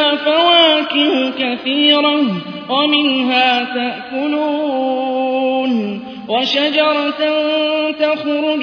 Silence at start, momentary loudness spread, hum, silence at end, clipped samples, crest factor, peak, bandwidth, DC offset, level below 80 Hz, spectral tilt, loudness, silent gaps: 0 s; 9 LU; none; 0 s; under 0.1%; 14 dB; 0 dBFS; 5.4 kHz; under 0.1%; -62 dBFS; -5 dB/octave; -14 LUFS; none